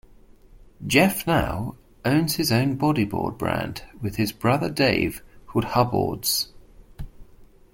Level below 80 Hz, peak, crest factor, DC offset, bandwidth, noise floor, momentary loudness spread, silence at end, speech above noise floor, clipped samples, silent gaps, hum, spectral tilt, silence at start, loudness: -44 dBFS; -2 dBFS; 22 dB; under 0.1%; 17 kHz; -50 dBFS; 14 LU; 0.3 s; 27 dB; under 0.1%; none; none; -5 dB/octave; 0.55 s; -23 LUFS